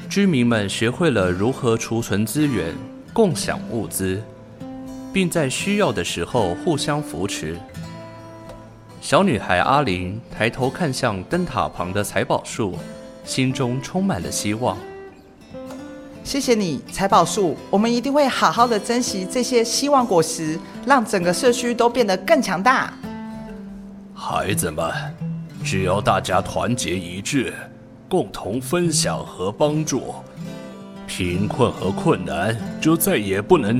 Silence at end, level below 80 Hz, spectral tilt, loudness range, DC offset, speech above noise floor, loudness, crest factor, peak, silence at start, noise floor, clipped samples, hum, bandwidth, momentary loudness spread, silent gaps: 0 s; -50 dBFS; -4.5 dB/octave; 5 LU; under 0.1%; 23 dB; -21 LUFS; 20 dB; -2 dBFS; 0 s; -43 dBFS; under 0.1%; none; 16 kHz; 17 LU; none